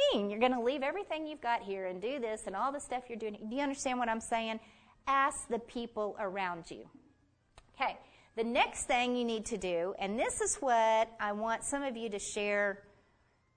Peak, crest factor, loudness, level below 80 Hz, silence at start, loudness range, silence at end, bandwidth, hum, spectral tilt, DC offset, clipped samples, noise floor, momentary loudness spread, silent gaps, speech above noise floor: -16 dBFS; 20 dB; -34 LUFS; -64 dBFS; 0 s; 5 LU; 0.75 s; 9.6 kHz; none; -2.5 dB/octave; under 0.1%; under 0.1%; -71 dBFS; 9 LU; none; 37 dB